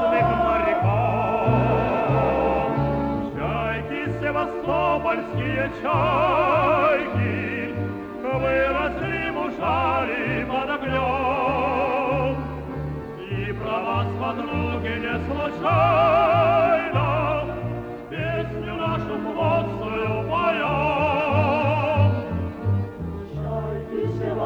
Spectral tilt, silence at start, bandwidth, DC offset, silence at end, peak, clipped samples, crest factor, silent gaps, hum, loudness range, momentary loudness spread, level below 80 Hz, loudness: -8.5 dB/octave; 0 s; 7.6 kHz; under 0.1%; 0 s; -8 dBFS; under 0.1%; 14 dB; none; none; 4 LU; 10 LU; -40 dBFS; -23 LUFS